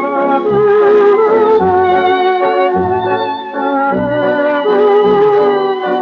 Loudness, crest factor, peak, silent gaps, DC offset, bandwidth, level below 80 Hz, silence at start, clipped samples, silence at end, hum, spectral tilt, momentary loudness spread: -11 LUFS; 10 dB; -2 dBFS; none; under 0.1%; 5.2 kHz; -50 dBFS; 0 s; under 0.1%; 0 s; none; -4 dB/octave; 6 LU